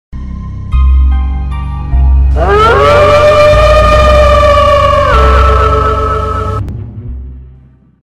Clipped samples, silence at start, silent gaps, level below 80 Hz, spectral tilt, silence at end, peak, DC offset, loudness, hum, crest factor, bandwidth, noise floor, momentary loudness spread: 0.2%; 0.15 s; none; -12 dBFS; -6 dB/octave; 0.65 s; 0 dBFS; under 0.1%; -8 LUFS; none; 8 dB; 10 kHz; -39 dBFS; 17 LU